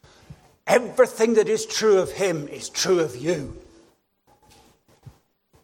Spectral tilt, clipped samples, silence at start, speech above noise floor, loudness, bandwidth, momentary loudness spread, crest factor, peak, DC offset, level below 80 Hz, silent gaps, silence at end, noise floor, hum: -3.5 dB/octave; under 0.1%; 0.3 s; 41 dB; -22 LUFS; 16.5 kHz; 11 LU; 20 dB; -4 dBFS; under 0.1%; -56 dBFS; none; 0.55 s; -62 dBFS; none